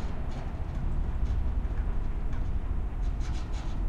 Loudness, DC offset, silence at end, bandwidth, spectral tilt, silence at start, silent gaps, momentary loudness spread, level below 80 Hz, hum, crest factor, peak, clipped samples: -35 LUFS; under 0.1%; 0 s; 7.4 kHz; -7.5 dB/octave; 0 s; none; 4 LU; -30 dBFS; none; 12 dB; -18 dBFS; under 0.1%